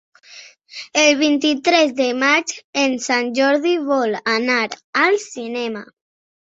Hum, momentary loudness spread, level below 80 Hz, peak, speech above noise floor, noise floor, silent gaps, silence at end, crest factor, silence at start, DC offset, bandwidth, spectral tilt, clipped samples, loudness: none; 10 LU; -68 dBFS; 0 dBFS; 25 dB; -43 dBFS; 2.64-2.73 s, 4.84-4.93 s; 0.65 s; 18 dB; 0.3 s; under 0.1%; 8 kHz; -2 dB/octave; under 0.1%; -17 LUFS